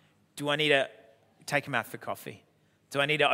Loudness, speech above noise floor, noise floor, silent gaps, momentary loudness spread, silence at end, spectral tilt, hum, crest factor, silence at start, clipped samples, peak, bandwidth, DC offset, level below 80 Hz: -29 LUFS; 31 dB; -59 dBFS; none; 18 LU; 0 s; -4 dB/octave; none; 22 dB; 0.35 s; under 0.1%; -8 dBFS; 16 kHz; under 0.1%; -80 dBFS